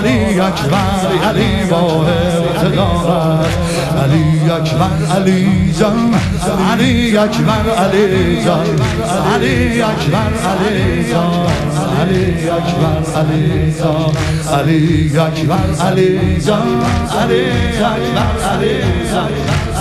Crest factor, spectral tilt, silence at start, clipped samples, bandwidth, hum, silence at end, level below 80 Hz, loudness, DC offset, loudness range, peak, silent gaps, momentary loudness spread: 12 dB; -6 dB/octave; 0 s; under 0.1%; 13.5 kHz; none; 0 s; -28 dBFS; -13 LUFS; under 0.1%; 2 LU; 0 dBFS; none; 3 LU